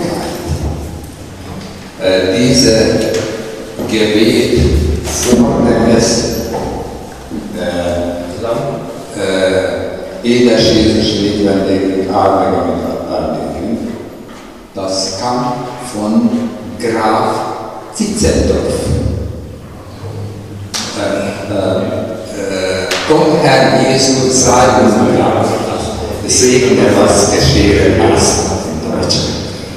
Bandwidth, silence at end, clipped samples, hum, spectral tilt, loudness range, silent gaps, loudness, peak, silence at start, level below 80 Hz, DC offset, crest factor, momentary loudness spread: 15.5 kHz; 0 s; under 0.1%; none; -4.5 dB/octave; 8 LU; none; -12 LUFS; 0 dBFS; 0 s; -28 dBFS; 0.4%; 12 dB; 16 LU